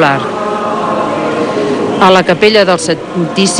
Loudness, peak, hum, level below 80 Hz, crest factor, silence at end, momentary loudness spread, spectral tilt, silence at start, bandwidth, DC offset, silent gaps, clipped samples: -11 LUFS; 0 dBFS; none; -48 dBFS; 10 dB; 0 s; 8 LU; -4 dB/octave; 0 s; 12 kHz; under 0.1%; none; 0.3%